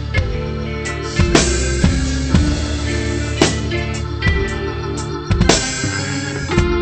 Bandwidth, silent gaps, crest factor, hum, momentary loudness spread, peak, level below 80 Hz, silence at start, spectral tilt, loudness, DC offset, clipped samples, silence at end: 8.8 kHz; none; 18 dB; none; 9 LU; 0 dBFS; -24 dBFS; 0 s; -4.5 dB/octave; -18 LUFS; under 0.1%; under 0.1%; 0 s